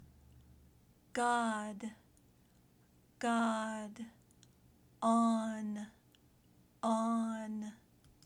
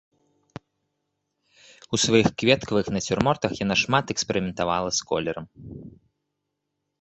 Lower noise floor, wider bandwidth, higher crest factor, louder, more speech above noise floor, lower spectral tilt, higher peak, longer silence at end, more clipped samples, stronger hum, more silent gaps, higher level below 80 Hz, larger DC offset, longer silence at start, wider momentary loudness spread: second, -68 dBFS vs -80 dBFS; first, 11.5 kHz vs 8.4 kHz; second, 18 dB vs 24 dB; second, -36 LUFS vs -23 LUFS; second, 32 dB vs 56 dB; about the same, -5 dB/octave vs -4 dB/octave; second, -20 dBFS vs -2 dBFS; second, 0.5 s vs 1.15 s; neither; neither; neither; second, -74 dBFS vs -52 dBFS; neither; second, 0 s vs 1.9 s; about the same, 17 LU vs 16 LU